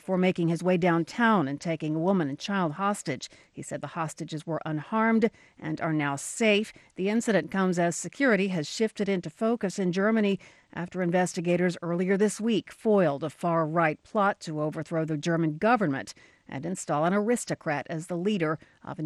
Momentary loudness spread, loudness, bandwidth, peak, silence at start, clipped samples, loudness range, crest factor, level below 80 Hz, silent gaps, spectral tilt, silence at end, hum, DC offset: 11 LU; -27 LUFS; 12.5 kHz; -10 dBFS; 0.05 s; under 0.1%; 3 LU; 16 dB; -68 dBFS; none; -5.5 dB/octave; 0 s; none; under 0.1%